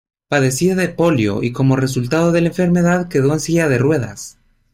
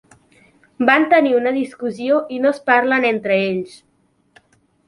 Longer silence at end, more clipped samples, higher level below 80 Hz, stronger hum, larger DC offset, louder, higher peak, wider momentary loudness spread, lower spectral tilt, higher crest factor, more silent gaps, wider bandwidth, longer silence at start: second, 0.45 s vs 1.2 s; neither; first, -44 dBFS vs -66 dBFS; neither; neither; about the same, -16 LUFS vs -17 LUFS; about the same, -4 dBFS vs -2 dBFS; second, 5 LU vs 11 LU; about the same, -6 dB/octave vs -6 dB/octave; second, 12 dB vs 18 dB; neither; first, 16 kHz vs 11.5 kHz; second, 0.3 s vs 0.8 s